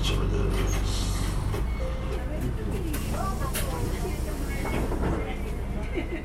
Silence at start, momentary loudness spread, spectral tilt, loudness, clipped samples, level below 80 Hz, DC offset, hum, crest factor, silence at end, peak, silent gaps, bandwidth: 0 s; 5 LU; -5.5 dB/octave; -30 LUFS; under 0.1%; -30 dBFS; under 0.1%; none; 14 dB; 0 s; -14 dBFS; none; 16.5 kHz